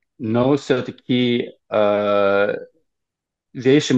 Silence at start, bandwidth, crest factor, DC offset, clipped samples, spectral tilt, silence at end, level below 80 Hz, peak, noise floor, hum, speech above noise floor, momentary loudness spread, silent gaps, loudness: 0.2 s; 8.4 kHz; 16 dB; under 0.1%; under 0.1%; -6 dB/octave; 0 s; -64 dBFS; -2 dBFS; -82 dBFS; none; 64 dB; 7 LU; none; -19 LUFS